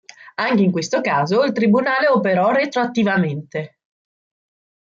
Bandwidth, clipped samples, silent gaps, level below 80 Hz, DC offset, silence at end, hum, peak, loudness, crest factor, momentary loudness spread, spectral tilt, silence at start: 7.6 kHz; under 0.1%; none; -64 dBFS; under 0.1%; 1.3 s; none; -6 dBFS; -18 LUFS; 14 dB; 12 LU; -6 dB/octave; 0.2 s